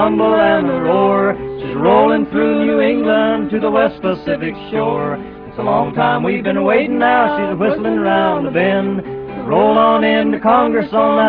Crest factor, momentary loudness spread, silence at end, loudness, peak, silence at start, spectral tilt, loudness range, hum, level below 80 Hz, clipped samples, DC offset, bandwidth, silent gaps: 14 dB; 9 LU; 0 s; -14 LUFS; 0 dBFS; 0 s; -9.5 dB/octave; 3 LU; none; -46 dBFS; under 0.1%; under 0.1%; 5.2 kHz; none